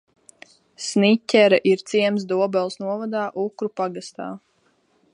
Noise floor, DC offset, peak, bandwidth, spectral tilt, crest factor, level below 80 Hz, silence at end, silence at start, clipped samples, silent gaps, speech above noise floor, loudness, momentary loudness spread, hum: -64 dBFS; under 0.1%; -2 dBFS; 11 kHz; -5 dB/octave; 20 dB; -74 dBFS; 0.75 s; 0.8 s; under 0.1%; none; 43 dB; -21 LUFS; 17 LU; none